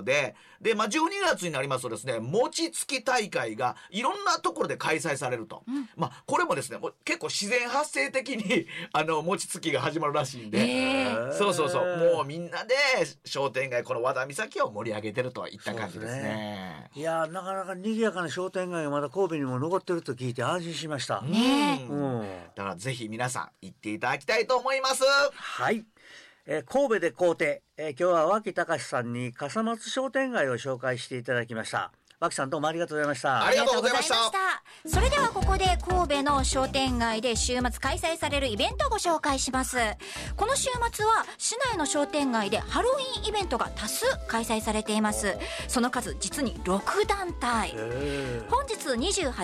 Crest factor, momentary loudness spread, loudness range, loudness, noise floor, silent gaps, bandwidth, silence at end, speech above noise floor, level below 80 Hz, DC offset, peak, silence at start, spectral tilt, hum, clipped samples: 14 dB; 9 LU; 4 LU; -28 LUFS; -52 dBFS; none; 15.5 kHz; 0 s; 24 dB; -44 dBFS; under 0.1%; -16 dBFS; 0 s; -3.5 dB/octave; none; under 0.1%